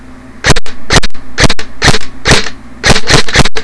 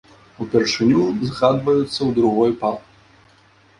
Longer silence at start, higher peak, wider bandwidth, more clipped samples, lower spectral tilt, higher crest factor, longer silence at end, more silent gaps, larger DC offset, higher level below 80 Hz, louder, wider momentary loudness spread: second, 0.1 s vs 0.4 s; about the same, 0 dBFS vs -2 dBFS; about the same, 11 kHz vs 11 kHz; first, 0.2% vs under 0.1%; second, -3 dB/octave vs -6 dB/octave; second, 6 dB vs 18 dB; second, 0 s vs 1 s; neither; neither; first, -18 dBFS vs -54 dBFS; first, -10 LUFS vs -18 LUFS; about the same, 7 LU vs 8 LU